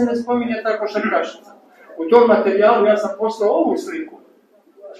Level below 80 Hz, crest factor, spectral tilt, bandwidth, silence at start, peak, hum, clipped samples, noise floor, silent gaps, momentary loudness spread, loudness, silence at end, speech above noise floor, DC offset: -66 dBFS; 18 dB; -5.5 dB/octave; 9.8 kHz; 0 s; 0 dBFS; none; under 0.1%; -53 dBFS; none; 16 LU; -17 LUFS; 0 s; 36 dB; under 0.1%